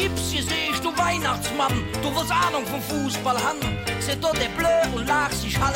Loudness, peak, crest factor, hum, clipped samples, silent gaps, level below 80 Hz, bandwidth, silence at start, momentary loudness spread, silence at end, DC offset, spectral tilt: -23 LUFS; -8 dBFS; 14 dB; none; under 0.1%; none; -40 dBFS; 17 kHz; 0 s; 5 LU; 0 s; under 0.1%; -3.5 dB/octave